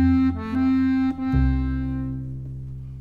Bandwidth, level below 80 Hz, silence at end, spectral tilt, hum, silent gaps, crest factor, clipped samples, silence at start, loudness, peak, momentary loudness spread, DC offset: 5 kHz; -30 dBFS; 0 s; -9.5 dB/octave; none; none; 12 dB; under 0.1%; 0 s; -23 LUFS; -10 dBFS; 14 LU; under 0.1%